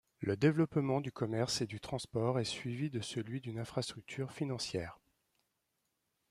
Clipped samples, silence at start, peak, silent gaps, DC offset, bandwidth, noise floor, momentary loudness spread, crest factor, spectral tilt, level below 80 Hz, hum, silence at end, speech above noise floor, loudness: under 0.1%; 0.2 s; -16 dBFS; none; under 0.1%; 13.5 kHz; -84 dBFS; 10 LU; 20 dB; -5.5 dB/octave; -68 dBFS; none; 1.35 s; 47 dB; -37 LUFS